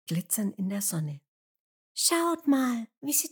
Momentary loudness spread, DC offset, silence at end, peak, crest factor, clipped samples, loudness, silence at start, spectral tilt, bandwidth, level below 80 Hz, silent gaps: 11 LU; under 0.1%; 0.05 s; -10 dBFS; 20 dB; under 0.1%; -28 LUFS; 0.05 s; -3.5 dB/octave; 19.5 kHz; under -90 dBFS; 1.28-1.95 s, 2.97-3.01 s